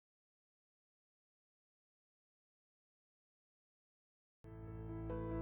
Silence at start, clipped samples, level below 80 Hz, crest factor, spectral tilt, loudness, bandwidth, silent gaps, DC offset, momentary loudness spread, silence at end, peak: 4.45 s; under 0.1%; -60 dBFS; 20 dB; -10.5 dB/octave; -48 LUFS; 3.7 kHz; none; under 0.1%; 15 LU; 0 s; -32 dBFS